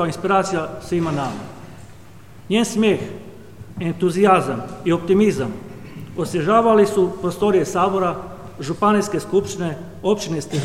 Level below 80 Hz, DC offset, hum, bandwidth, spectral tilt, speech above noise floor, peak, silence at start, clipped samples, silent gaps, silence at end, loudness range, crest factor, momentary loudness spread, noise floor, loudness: -50 dBFS; 0.6%; none; 15.5 kHz; -6 dB/octave; 24 dB; -2 dBFS; 0 s; under 0.1%; none; 0 s; 5 LU; 18 dB; 17 LU; -43 dBFS; -19 LUFS